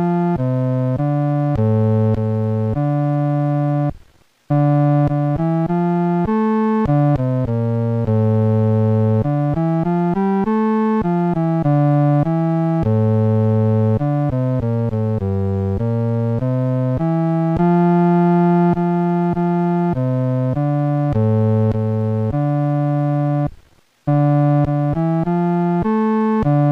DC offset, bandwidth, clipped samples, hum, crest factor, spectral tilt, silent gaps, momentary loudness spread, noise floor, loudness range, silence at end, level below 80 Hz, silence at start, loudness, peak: under 0.1%; 5 kHz; under 0.1%; none; 10 dB; -11 dB/octave; none; 5 LU; -50 dBFS; 2 LU; 0 s; -42 dBFS; 0 s; -17 LUFS; -6 dBFS